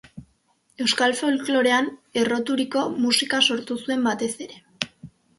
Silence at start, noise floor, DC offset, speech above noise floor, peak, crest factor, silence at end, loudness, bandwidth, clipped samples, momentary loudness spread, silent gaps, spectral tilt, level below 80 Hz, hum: 0.15 s; -65 dBFS; under 0.1%; 42 dB; -2 dBFS; 22 dB; 0.3 s; -22 LUFS; 11.5 kHz; under 0.1%; 12 LU; none; -2.5 dB/octave; -64 dBFS; none